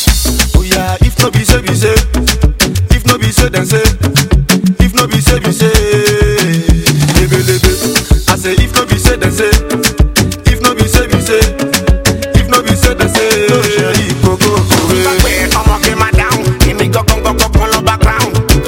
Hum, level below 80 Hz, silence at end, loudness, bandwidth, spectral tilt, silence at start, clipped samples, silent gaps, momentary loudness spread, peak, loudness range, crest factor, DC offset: none; -14 dBFS; 0 s; -10 LUFS; over 20 kHz; -4.5 dB/octave; 0 s; 1%; none; 2 LU; 0 dBFS; 1 LU; 10 dB; 0.2%